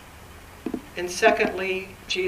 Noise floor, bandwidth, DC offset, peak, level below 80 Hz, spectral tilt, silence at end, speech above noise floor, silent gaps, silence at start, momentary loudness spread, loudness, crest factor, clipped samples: -45 dBFS; 15.5 kHz; under 0.1%; -4 dBFS; -52 dBFS; -3 dB/octave; 0 s; 21 dB; none; 0 s; 25 LU; -25 LUFS; 24 dB; under 0.1%